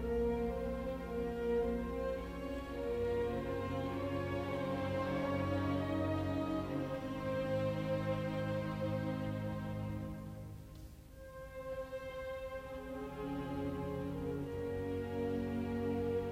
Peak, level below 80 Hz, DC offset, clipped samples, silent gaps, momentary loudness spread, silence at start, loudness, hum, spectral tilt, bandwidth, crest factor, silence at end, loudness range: -24 dBFS; -52 dBFS; under 0.1%; under 0.1%; none; 9 LU; 0 s; -39 LUFS; none; -7.5 dB/octave; 16 kHz; 14 dB; 0 s; 7 LU